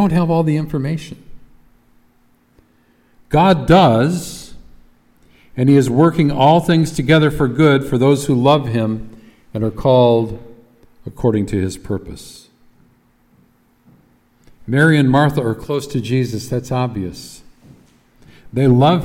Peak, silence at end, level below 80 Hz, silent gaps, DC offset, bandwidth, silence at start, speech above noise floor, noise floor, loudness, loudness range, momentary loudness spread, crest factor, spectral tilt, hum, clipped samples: 0 dBFS; 0 s; -42 dBFS; none; under 0.1%; 16 kHz; 0 s; 41 dB; -55 dBFS; -15 LUFS; 10 LU; 18 LU; 16 dB; -7 dB/octave; none; under 0.1%